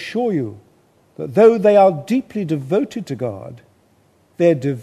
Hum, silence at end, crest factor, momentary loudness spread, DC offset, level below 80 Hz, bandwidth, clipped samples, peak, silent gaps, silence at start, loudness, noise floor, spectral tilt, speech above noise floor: none; 0 s; 16 dB; 17 LU; under 0.1%; -64 dBFS; 13 kHz; under 0.1%; -2 dBFS; none; 0 s; -17 LUFS; -56 dBFS; -7.5 dB/octave; 40 dB